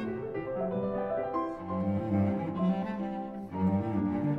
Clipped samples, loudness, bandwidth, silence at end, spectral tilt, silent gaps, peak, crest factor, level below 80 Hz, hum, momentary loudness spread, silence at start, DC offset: under 0.1%; -32 LUFS; 5.2 kHz; 0 s; -10.5 dB/octave; none; -18 dBFS; 14 dB; -58 dBFS; none; 6 LU; 0 s; under 0.1%